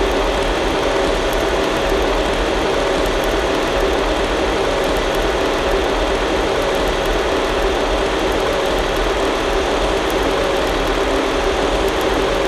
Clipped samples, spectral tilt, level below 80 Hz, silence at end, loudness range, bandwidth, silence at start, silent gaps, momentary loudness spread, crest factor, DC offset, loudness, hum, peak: under 0.1%; -4 dB/octave; -26 dBFS; 0 s; 0 LU; 13.5 kHz; 0 s; none; 1 LU; 12 dB; under 0.1%; -17 LUFS; none; -4 dBFS